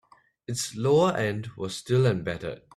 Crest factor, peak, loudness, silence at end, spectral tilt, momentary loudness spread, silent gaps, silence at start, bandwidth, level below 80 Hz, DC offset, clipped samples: 16 dB; -10 dBFS; -26 LUFS; 0.2 s; -5.5 dB/octave; 13 LU; none; 0.5 s; 13.5 kHz; -60 dBFS; under 0.1%; under 0.1%